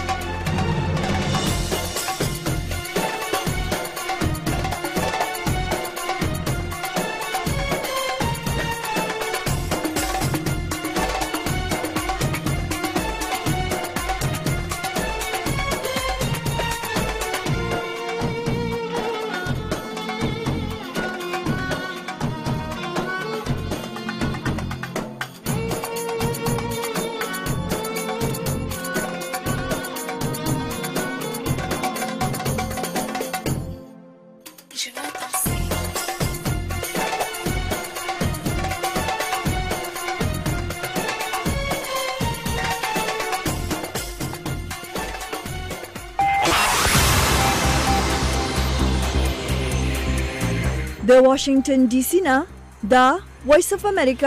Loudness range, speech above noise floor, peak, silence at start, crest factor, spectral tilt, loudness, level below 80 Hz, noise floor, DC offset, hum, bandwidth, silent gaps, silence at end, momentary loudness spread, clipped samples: 7 LU; 28 dB; -6 dBFS; 0 s; 18 dB; -4.5 dB/octave; -23 LUFS; -34 dBFS; -45 dBFS; under 0.1%; none; 15.5 kHz; none; 0 s; 9 LU; under 0.1%